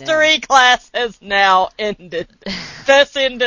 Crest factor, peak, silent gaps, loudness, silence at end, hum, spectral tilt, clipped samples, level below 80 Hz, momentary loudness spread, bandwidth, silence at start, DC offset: 16 dB; 0 dBFS; none; -14 LUFS; 0 s; none; -1.5 dB/octave; under 0.1%; -50 dBFS; 15 LU; 8 kHz; 0 s; under 0.1%